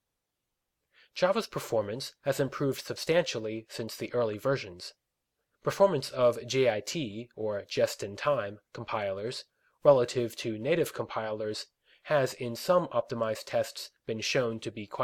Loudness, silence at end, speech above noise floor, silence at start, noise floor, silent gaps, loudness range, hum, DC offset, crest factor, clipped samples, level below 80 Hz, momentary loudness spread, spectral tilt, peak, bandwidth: -30 LUFS; 0 s; 55 dB; 1.15 s; -85 dBFS; none; 2 LU; none; under 0.1%; 22 dB; under 0.1%; -70 dBFS; 12 LU; -4.5 dB/octave; -8 dBFS; 17 kHz